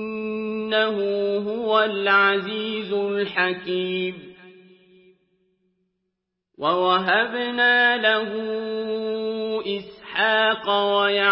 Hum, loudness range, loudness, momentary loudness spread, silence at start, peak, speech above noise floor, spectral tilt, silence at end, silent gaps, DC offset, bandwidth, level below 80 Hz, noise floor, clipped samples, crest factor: none; 7 LU; -22 LUFS; 10 LU; 0 s; -6 dBFS; 58 dB; -8.5 dB/octave; 0 s; none; under 0.1%; 5.8 kHz; -68 dBFS; -80 dBFS; under 0.1%; 18 dB